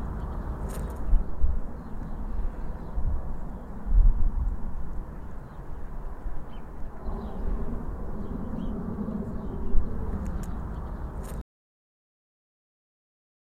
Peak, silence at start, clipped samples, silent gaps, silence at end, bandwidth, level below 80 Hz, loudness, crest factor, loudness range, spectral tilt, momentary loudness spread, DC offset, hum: -6 dBFS; 0 s; under 0.1%; none; 2.1 s; 9.2 kHz; -30 dBFS; -35 LUFS; 20 dB; 6 LU; -8.5 dB/octave; 11 LU; under 0.1%; none